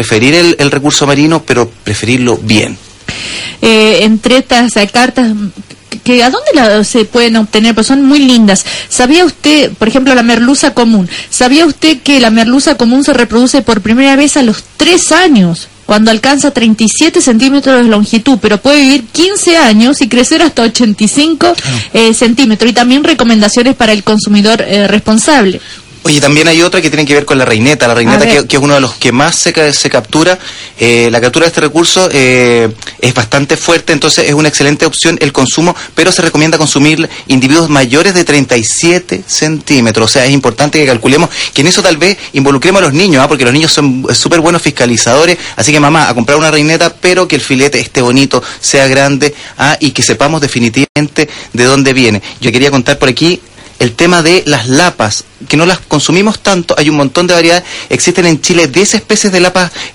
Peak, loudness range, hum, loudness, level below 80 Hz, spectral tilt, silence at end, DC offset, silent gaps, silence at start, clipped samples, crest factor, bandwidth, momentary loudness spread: 0 dBFS; 2 LU; none; -7 LUFS; -38 dBFS; -4 dB/octave; 0.05 s; under 0.1%; 50.89-50.95 s; 0 s; 1%; 8 dB; 16.5 kHz; 5 LU